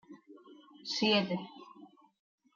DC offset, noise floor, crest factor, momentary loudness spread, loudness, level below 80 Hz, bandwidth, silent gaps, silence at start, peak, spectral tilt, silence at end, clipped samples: under 0.1%; -57 dBFS; 22 dB; 26 LU; -31 LUFS; -82 dBFS; 7.4 kHz; none; 0.1 s; -16 dBFS; -4.5 dB/octave; 0.7 s; under 0.1%